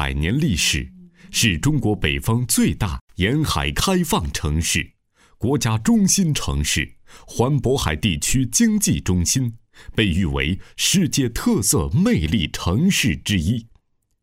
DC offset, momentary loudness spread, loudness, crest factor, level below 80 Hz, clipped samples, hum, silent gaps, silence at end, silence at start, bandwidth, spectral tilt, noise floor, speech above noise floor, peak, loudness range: under 0.1%; 7 LU; -20 LUFS; 18 dB; -32 dBFS; under 0.1%; none; 3.01-3.07 s; 0.6 s; 0 s; 16 kHz; -4 dB/octave; -59 dBFS; 40 dB; -2 dBFS; 2 LU